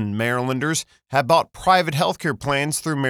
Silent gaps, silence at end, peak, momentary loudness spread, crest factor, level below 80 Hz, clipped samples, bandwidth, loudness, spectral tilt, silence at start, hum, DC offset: none; 0 s; -2 dBFS; 6 LU; 18 dB; -52 dBFS; under 0.1%; 20 kHz; -21 LUFS; -4.5 dB/octave; 0 s; none; under 0.1%